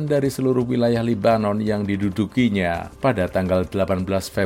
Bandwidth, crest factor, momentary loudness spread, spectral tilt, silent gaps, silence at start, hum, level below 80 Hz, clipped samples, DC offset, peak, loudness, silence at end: 16.5 kHz; 16 dB; 4 LU; -7 dB/octave; none; 0 s; none; -46 dBFS; under 0.1%; under 0.1%; -4 dBFS; -21 LUFS; 0 s